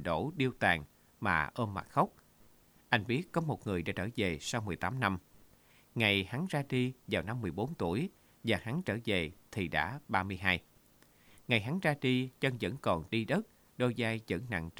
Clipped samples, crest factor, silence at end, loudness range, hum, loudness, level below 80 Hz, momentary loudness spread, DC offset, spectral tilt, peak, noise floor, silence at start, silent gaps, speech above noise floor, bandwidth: under 0.1%; 24 dB; 0.1 s; 2 LU; none; -34 LUFS; -60 dBFS; 6 LU; under 0.1%; -5.5 dB/octave; -10 dBFS; -64 dBFS; 0 s; none; 30 dB; over 20 kHz